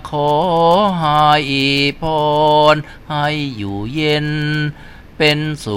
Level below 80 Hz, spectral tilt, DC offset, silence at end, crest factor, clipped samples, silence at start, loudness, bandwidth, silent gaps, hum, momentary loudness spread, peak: -40 dBFS; -5.5 dB/octave; under 0.1%; 0 s; 16 dB; under 0.1%; 0 s; -15 LUFS; 15.5 kHz; none; none; 9 LU; 0 dBFS